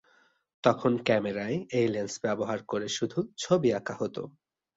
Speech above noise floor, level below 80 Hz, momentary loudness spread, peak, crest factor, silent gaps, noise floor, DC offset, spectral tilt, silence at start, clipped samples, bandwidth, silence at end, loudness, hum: 37 dB; -66 dBFS; 9 LU; -8 dBFS; 22 dB; none; -66 dBFS; under 0.1%; -5 dB/octave; 0.65 s; under 0.1%; 8 kHz; 0.45 s; -29 LUFS; none